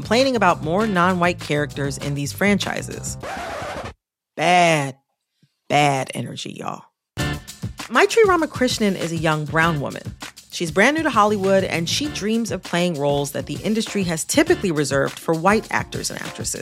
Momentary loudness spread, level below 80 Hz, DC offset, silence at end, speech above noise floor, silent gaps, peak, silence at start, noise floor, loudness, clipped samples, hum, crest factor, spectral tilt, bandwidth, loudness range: 14 LU; -46 dBFS; under 0.1%; 0 s; 45 dB; none; -2 dBFS; 0 s; -64 dBFS; -20 LUFS; under 0.1%; none; 20 dB; -4.5 dB/octave; 16 kHz; 3 LU